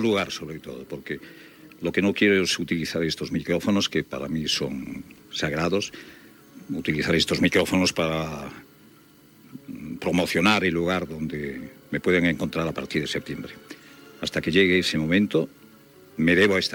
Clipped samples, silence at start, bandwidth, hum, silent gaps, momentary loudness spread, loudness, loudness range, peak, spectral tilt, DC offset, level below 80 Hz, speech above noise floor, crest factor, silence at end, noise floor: under 0.1%; 0 s; 18 kHz; none; none; 17 LU; -24 LUFS; 3 LU; -6 dBFS; -4.5 dB/octave; under 0.1%; -56 dBFS; 29 dB; 18 dB; 0 s; -53 dBFS